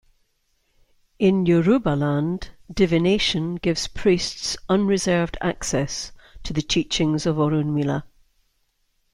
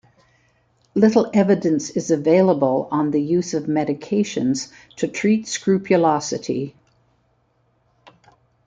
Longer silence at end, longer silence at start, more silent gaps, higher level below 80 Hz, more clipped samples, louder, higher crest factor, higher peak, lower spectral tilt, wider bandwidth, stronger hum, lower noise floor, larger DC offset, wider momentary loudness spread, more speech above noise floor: second, 1.05 s vs 1.95 s; first, 1.2 s vs 0.95 s; neither; first, -44 dBFS vs -62 dBFS; neither; about the same, -22 LUFS vs -20 LUFS; about the same, 16 dB vs 18 dB; second, -6 dBFS vs -2 dBFS; about the same, -5 dB/octave vs -6 dB/octave; first, 12.5 kHz vs 9.2 kHz; neither; first, -68 dBFS vs -64 dBFS; neither; about the same, 10 LU vs 10 LU; about the same, 47 dB vs 45 dB